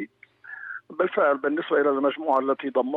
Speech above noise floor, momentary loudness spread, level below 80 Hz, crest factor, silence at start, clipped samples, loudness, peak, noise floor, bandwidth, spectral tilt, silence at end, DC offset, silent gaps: 22 dB; 16 LU; -82 dBFS; 16 dB; 0 s; under 0.1%; -24 LUFS; -10 dBFS; -46 dBFS; 4.2 kHz; -7.5 dB/octave; 0 s; under 0.1%; none